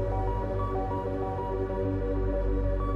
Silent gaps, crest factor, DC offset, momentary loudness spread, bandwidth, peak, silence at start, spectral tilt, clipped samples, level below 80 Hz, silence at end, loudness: none; 12 dB; under 0.1%; 2 LU; 4.8 kHz; -18 dBFS; 0 s; -10 dB/octave; under 0.1%; -32 dBFS; 0 s; -31 LUFS